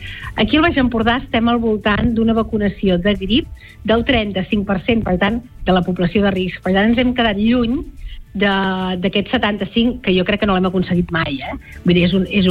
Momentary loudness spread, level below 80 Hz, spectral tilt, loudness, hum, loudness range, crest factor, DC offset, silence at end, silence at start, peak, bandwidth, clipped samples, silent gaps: 6 LU; -32 dBFS; -8 dB/octave; -17 LUFS; none; 1 LU; 14 dB; under 0.1%; 0 s; 0 s; -2 dBFS; 5.2 kHz; under 0.1%; none